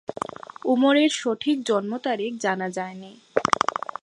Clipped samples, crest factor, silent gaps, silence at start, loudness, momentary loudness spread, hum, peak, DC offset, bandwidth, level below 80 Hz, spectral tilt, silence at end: under 0.1%; 24 dB; none; 0.1 s; -24 LUFS; 14 LU; none; 0 dBFS; under 0.1%; 11.5 kHz; -66 dBFS; -4 dB/octave; 0.3 s